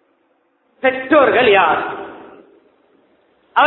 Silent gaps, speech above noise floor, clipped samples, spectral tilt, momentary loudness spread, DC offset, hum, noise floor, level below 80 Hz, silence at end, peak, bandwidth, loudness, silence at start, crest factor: none; 48 dB; under 0.1%; -7 dB/octave; 17 LU; under 0.1%; none; -61 dBFS; -56 dBFS; 0 s; 0 dBFS; 4.2 kHz; -14 LUFS; 0.85 s; 18 dB